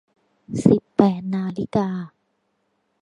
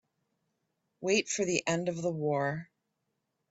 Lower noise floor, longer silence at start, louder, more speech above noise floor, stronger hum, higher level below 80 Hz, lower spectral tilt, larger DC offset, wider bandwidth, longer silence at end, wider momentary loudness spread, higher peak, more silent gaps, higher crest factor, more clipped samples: second, -71 dBFS vs -82 dBFS; second, 0.5 s vs 1 s; first, -21 LUFS vs -31 LUFS; about the same, 50 dB vs 51 dB; neither; first, -54 dBFS vs -72 dBFS; first, -8.5 dB/octave vs -4 dB/octave; neither; first, 11 kHz vs 8.4 kHz; about the same, 0.95 s vs 0.85 s; first, 14 LU vs 7 LU; first, 0 dBFS vs -12 dBFS; neither; about the same, 22 dB vs 22 dB; neither